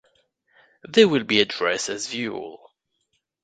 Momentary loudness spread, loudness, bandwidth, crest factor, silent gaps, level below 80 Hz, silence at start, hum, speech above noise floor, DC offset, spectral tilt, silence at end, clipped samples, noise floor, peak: 14 LU; -21 LUFS; 9.4 kHz; 22 dB; none; -66 dBFS; 0.9 s; none; 52 dB; under 0.1%; -3.5 dB/octave; 0.9 s; under 0.1%; -74 dBFS; -2 dBFS